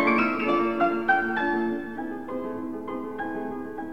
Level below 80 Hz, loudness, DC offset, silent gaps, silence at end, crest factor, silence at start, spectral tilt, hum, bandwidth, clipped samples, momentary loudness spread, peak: -60 dBFS; -27 LUFS; 0.5%; none; 0 s; 16 dB; 0 s; -6.5 dB/octave; none; 6.6 kHz; under 0.1%; 11 LU; -10 dBFS